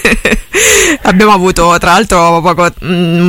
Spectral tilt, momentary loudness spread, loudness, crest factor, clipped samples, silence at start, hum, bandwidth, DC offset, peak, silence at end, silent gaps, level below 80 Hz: -3.5 dB/octave; 5 LU; -7 LUFS; 8 dB; 0.3%; 0 s; none; 17 kHz; under 0.1%; 0 dBFS; 0 s; none; -24 dBFS